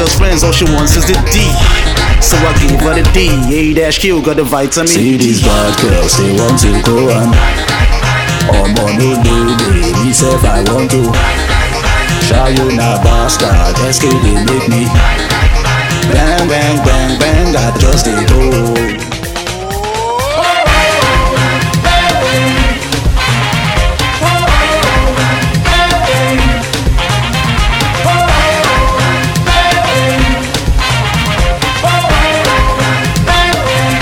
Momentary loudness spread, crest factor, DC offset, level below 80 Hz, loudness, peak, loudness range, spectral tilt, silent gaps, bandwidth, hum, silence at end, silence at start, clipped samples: 3 LU; 10 dB; under 0.1%; -14 dBFS; -10 LUFS; 0 dBFS; 1 LU; -4.5 dB/octave; none; 19 kHz; none; 0 s; 0 s; under 0.1%